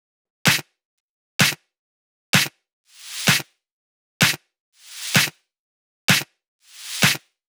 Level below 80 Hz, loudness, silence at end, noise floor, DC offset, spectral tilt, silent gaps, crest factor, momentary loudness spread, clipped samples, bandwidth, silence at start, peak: -68 dBFS; -20 LUFS; 0.3 s; under -90 dBFS; under 0.1%; -2 dB/octave; 0.85-1.39 s, 1.79-2.33 s, 2.73-2.84 s, 3.72-4.20 s, 4.60-4.72 s, 5.59-6.08 s, 6.48-6.59 s; 22 dB; 16 LU; under 0.1%; over 20 kHz; 0.45 s; -2 dBFS